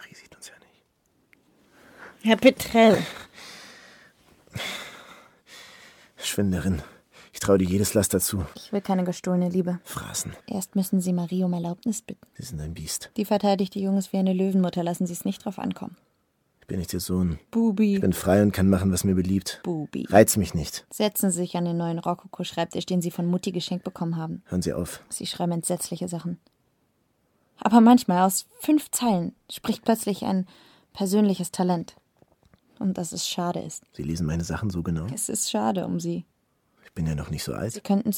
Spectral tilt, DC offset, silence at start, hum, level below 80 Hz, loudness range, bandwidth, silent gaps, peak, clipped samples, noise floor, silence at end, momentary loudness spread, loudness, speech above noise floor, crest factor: -5.5 dB/octave; under 0.1%; 0 s; none; -50 dBFS; 7 LU; 19 kHz; none; -2 dBFS; under 0.1%; -70 dBFS; 0 s; 15 LU; -25 LUFS; 46 dB; 24 dB